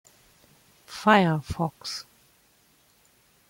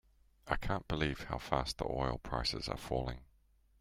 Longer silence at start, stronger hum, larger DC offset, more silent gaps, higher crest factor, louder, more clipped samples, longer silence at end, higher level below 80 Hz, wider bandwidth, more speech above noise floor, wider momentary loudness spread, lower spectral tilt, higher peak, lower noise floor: first, 0.9 s vs 0.45 s; neither; neither; neither; about the same, 22 dB vs 24 dB; first, -24 LUFS vs -38 LUFS; neither; first, 1.5 s vs 0.55 s; second, -56 dBFS vs -48 dBFS; about the same, 16.5 kHz vs 16 kHz; first, 39 dB vs 32 dB; first, 17 LU vs 5 LU; about the same, -5.5 dB/octave vs -5 dB/octave; first, -6 dBFS vs -14 dBFS; second, -62 dBFS vs -69 dBFS